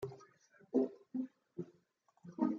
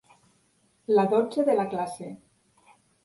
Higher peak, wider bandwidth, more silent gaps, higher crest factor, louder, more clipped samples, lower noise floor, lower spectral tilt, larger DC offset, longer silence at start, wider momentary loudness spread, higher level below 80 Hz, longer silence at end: second, -20 dBFS vs -10 dBFS; second, 6.8 kHz vs 11.5 kHz; neither; about the same, 22 dB vs 18 dB; second, -41 LUFS vs -25 LUFS; neither; first, -75 dBFS vs -67 dBFS; first, -9 dB/octave vs -6.5 dB/octave; neither; second, 0 s vs 0.9 s; about the same, 19 LU vs 19 LU; second, -82 dBFS vs -72 dBFS; second, 0 s vs 0.9 s